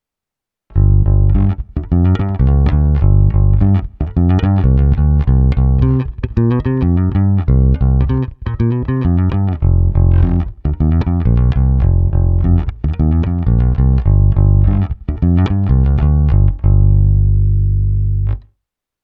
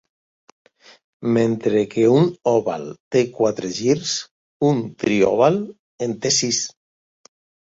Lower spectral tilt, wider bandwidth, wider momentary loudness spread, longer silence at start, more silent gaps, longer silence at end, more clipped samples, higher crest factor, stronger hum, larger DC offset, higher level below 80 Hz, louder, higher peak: first, -11.5 dB/octave vs -4.5 dB/octave; second, 4.1 kHz vs 8 kHz; second, 6 LU vs 11 LU; second, 0.75 s vs 1.2 s; second, none vs 3.00-3.11 s, 4.31-4.60 s, 5.79-5.98 s; second, 0.65 s vs 1.05 s; neither; second, 12 dB vs 18 dB; first, 50 Hz at -30 dBFS vs none; neither; first, -16 dBFS vs -60 dBFS; first, -14 LUFS vs -20 LUFS; first, 0 dBFS vs -4 dBFS